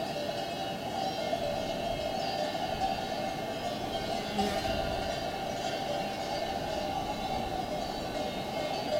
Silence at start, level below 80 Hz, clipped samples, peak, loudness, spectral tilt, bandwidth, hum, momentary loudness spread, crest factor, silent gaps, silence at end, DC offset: 0 s; -50 dBFS; under 0.1%; -16 dBFS; -33 LUFS; -4.5 dB/octave; 16 kHz; none; 3 LU; 16 dB; none; 0 s; under 0.1%